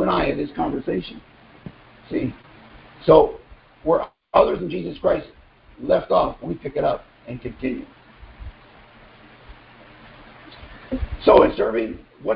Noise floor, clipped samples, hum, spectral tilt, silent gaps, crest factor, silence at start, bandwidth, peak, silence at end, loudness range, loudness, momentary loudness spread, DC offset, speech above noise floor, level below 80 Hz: -48 dBFS; under 0.1%; none; -11 dB/octave; none; 22 dB; 0 s; 5.2 kHz; 0 dBFS; 0 s; 15 LU; -21 LUFS; 27 LU; under 0.1%; 28 dB; -42 dBFS